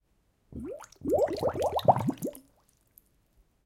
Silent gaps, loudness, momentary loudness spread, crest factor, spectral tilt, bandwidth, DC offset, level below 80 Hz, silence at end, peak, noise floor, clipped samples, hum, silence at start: none; -29 LUFS; 17 LU; 24 dB; -6.5 dB/octave; 17 kHz; under 0.1%; -58 dBFS; 1.25 s; -8 dBFS; -70 dBFS; under 0.1%; none; 0.5 s